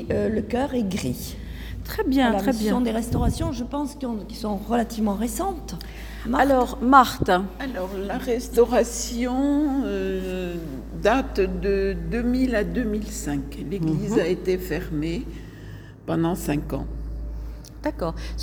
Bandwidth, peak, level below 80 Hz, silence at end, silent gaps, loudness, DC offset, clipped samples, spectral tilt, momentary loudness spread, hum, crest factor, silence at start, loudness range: 19.5 kHz; -2 dBFS; -36 dBFS; 0 s; none; -24 LUFS; under 0.1%; under 0.1%; -5.5 dB/octave; 14 LU; none; 22 dB; 0 s; 6 LU